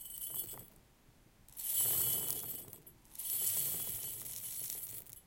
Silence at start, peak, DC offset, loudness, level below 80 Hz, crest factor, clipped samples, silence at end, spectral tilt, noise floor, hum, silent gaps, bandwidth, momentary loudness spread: 0 s; -12 dBFS; under 0.1%; -36 LUFS; -68 dBFS; 28 dB; under 0.1%; 0.05 s; -1 dB/octave; -65 dBFS; none; none; 17 kHz; 18 LU